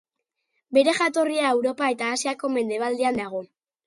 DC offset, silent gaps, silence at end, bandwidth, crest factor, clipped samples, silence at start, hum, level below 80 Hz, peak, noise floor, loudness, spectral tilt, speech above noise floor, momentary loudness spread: under 0.1%; none; 0.4 s; 11.5 kHz; 18 dB; under 0.1%; 0.7 s; none; -68 dBFS; -6 dBFS; -80 dBFS; -23 LUFS; -3 dB/octave; 57 dB; 6 LU